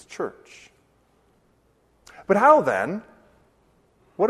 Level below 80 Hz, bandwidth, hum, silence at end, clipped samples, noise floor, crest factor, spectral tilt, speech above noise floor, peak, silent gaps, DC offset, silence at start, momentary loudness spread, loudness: -66 dBFS; 12.5 kHz; none; 0 s; under 0.1%; -63 dBFS; 22 dB; -6.5 dB/octave; 43 dB; -2 dBFS; none; under 0.1%; 0.1 s; 24 LU; -21 LUFS